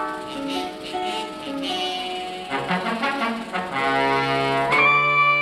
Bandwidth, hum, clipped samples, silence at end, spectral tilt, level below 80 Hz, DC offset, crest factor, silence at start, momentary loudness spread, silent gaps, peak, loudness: 15 kHz; none; under 0.1%; 0 s; -4 dB/octave; -56 dBFS; under 0.1%; 16 dB; 0 s; 13 LU; none; -6 dBFS; -22 LUFS